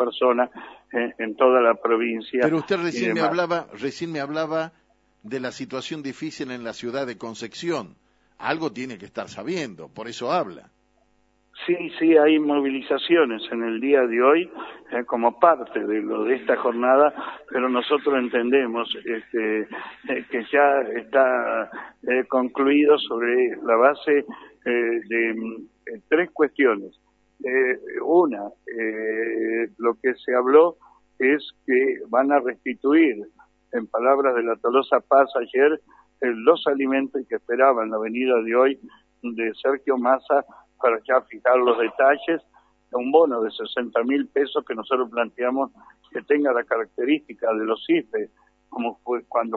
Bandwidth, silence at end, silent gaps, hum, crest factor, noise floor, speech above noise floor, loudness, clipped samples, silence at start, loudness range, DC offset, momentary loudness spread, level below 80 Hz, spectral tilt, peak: 8 kHz; 0 s; none; none; 20 dB; -64 dBFS; 43 dB; -22 LUFS; under 0.1%; 0 s; 9 LU; under 0.1%; 13 LU; -70 dBFS; -5.5 dB/octave; -2 dBFS